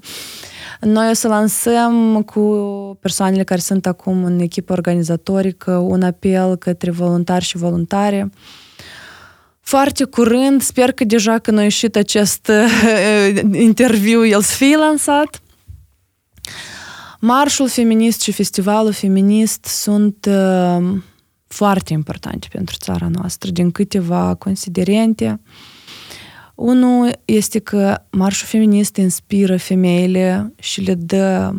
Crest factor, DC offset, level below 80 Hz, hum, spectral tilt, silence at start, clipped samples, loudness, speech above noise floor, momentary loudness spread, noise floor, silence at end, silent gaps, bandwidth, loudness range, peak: 14 dB; under 0.1%; -52 dBFS; none; -5 dB/octave; 0.05 s; under 0.1%; -15 LUFS; 46 dB; 13 LU; -60 dBFS; 0 s; none; 17.5 kHz; 6 LU; 0 dBFS